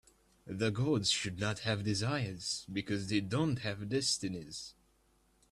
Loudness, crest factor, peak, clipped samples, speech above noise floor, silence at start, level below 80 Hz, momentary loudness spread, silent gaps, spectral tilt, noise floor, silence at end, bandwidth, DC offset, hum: -34 LUFS; 18 dB; -18 dBFS; under 0.1%; 36 dB; 0.45 s; -64 dBFS; 10 LU; none; -4 dB/octave; -71 dBFS; 0.8 s; 13 kHz; under 0.1%; none